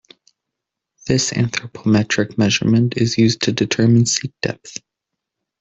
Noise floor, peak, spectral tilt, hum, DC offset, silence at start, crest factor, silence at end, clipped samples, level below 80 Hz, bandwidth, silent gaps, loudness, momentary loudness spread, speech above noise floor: -81 dBFS; -2 dBFS; -5 dB/octave; none; under 0.1%; 1.05 s; 16 dB; 0.85 s; under 0.1%; -50 dBFS; 8.2 kHz; none; -17 LUFS; 11 LU; 64 dB